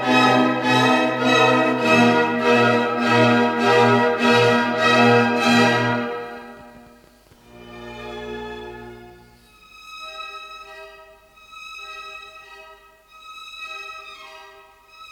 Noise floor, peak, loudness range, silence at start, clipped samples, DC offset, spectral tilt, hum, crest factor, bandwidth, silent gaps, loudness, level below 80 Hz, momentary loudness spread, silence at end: -51 dBFS; -2 dBFS; 21 LU; 0 s; under 0.1%; under 0.1%; -5 dB/octave; 50 Hz at -60 dBFS; 18 dB; 14.5 kHz; none; -16 LUFS; -58 dBFS; 22 LU; 0.05 s